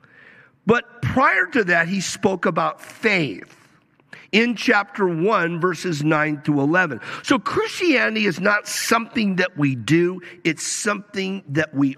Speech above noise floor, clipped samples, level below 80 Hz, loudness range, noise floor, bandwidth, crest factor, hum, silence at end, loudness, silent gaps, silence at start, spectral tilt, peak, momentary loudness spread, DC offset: 36 dB; under 0.1%; -56 dBFS; 2 LU; -56 dBFS; 15 kHz; 18 dB; none; 0 s; -20 LUFS; none; 0.65 s; -4.5 dB/octave; -2 dBFS; 7 LU; under 0.1%